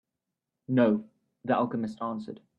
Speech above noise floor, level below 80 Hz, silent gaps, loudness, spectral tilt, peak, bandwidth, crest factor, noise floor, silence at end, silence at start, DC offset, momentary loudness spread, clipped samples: 59 dB; -72 dBFS; none; -29 LUFS; -9 dB/octave; -12 dBFS; 7.4 kHz; 20 dB; -87 dBFS; 0.2 s; 0.7 s; under 0.1%; 12 LU; under 0.1%